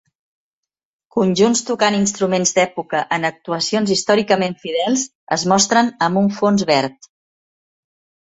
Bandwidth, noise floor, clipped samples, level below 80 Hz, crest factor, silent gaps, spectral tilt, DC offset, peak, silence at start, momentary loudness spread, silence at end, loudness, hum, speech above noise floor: 8.2 kHz; under -90 dBFS; under 0.1%; -60 dBFS; 18 dB; 5.15-5.27 s; -3.5 dB/octave; under 0.1%; 0 dBFS; 1.15 s; 6 LU; 1.35 s; -17 LUFS; none; over 73 dB